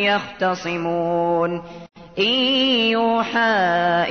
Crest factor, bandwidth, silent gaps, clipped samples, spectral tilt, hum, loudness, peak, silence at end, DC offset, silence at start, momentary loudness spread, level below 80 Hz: 12 dB; 6.6 kHz; none; under 0.1%; -5 dB/octave; none; -19 LUFS; -8 dBFS; 0 s; 0.2%; 0 s; 8 LU; -58 dBFS